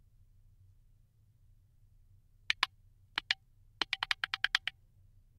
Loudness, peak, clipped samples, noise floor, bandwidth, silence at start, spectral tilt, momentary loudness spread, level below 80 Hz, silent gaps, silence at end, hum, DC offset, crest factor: -35 LUFS; -8 dBFS; under 0.1%; -66 dBFS; 16 kHz; 2.5 s; 0 dB/octave; 8 LU; -66 dBFS; none; 0.7 s; none; under 0.1%; 34 dB